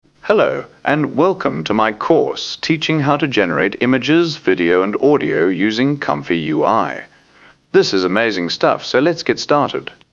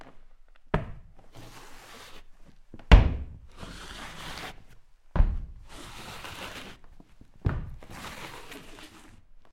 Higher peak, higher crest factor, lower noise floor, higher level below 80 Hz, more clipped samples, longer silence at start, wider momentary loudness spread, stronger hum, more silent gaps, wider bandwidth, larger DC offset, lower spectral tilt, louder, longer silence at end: first, 0 dBFS vs -4 dBFS; second, 16 dB vs 26 dB; about the same, -48 dBFS vs -51 dBFS; second, -56 dBFS vs -30 dBFS; neither; first, 0.25 s vs 0 s; second, 5 LU vs 22 LU; neither; neither; second, 7.6 kHz vs 13 kHz; neither; about the same, -5.5 dB/octave vs -6 dB/octave; first, -16 LUFS vs -30 LUFS; about the same, 0.2 s vs 0.1 s